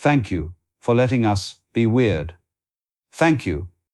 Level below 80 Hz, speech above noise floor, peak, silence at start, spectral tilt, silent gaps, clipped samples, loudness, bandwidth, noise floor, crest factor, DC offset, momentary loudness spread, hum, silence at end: -42 dBFS; over 71 dB; -6 dBFS; 0 s; -7 dB/octave; none; under 0.1%; -21 LUFS; 12 kHz; under -90 dBFS; 16 dB; under 0.1%; 12 LU; none; 0.25 s